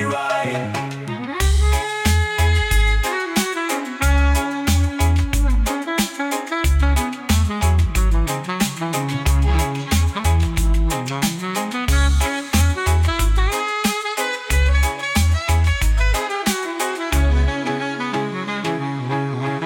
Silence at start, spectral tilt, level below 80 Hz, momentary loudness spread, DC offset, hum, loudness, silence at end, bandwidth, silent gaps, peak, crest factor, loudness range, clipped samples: 0 s; -4.5 dB/octave; -22 dBFS; 6 LU; under 0.1%; none; -20 LUFS; 0 s; 17.5 kHz; none; -4 dBFS; 14 dB; 1 LU; under 0.1%